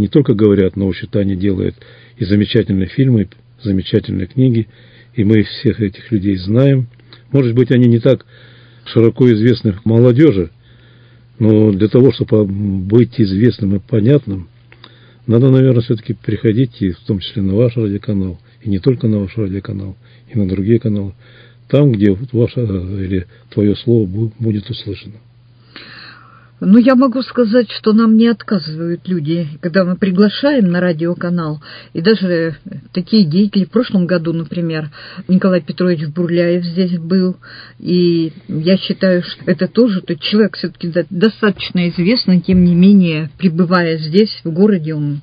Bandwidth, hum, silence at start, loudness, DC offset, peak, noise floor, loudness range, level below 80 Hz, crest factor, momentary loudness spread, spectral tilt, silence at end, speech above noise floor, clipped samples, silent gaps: 5.2 kHz; none; 0 s; -14 LUFS; under 0.1%; 0 dBFS; -44 dBFS; 4 LU; -40 dBFS; 14 dB; 11 LU; -10.5 dB/octave; 0 s; 30 dB; 0.2%; none